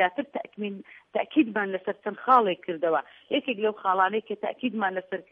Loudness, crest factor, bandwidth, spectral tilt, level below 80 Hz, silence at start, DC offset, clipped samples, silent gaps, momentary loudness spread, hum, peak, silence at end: -27 LUFS; 20 dB; 4.8 kHz; -7.5 dB/octave; -82 dBFS; 0 s; under 0.1%; under 0.1%; none; 13 LU; none; -6 dBFS; 0.1 s